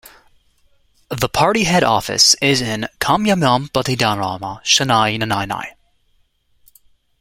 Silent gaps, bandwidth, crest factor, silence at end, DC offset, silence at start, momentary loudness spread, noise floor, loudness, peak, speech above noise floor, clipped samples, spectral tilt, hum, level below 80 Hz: none; 16.5 kHz; 18 dB; 1.5 s; under 0.1%; 1.1 s; 12 LU; -60 dBFS; -16 LUFS; 0 dBFS; 43 dB; under 0.1%; -3 dB/octave; none; -46 dBFS